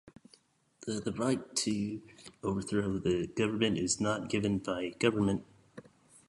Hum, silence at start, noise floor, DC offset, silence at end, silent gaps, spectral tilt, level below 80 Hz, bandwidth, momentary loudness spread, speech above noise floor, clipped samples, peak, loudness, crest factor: none; 0.8 s; -66 dBFS; under 0.1%; 0.45 s; none; -4.5 dB/octave; -60 dBFS; 11.5 kHz; 9 LU; 34 dB; under 0.1%; -12 dBFS; -33 LUFS; 20 dB